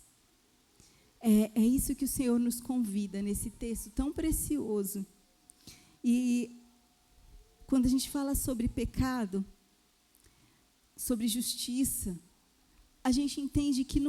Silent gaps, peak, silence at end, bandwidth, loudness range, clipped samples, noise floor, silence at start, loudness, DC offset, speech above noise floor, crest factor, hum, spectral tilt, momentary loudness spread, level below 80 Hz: none; -16 dBFS; 0 s; 17.5 kHz; 5 LU; under 0.1%; -68 dBFS; 1.2 s; -32 LUFS; under 0.1%; 38 dB; 18 dB; none; -4.5 dB/octave; 10 LU; -48 dBFS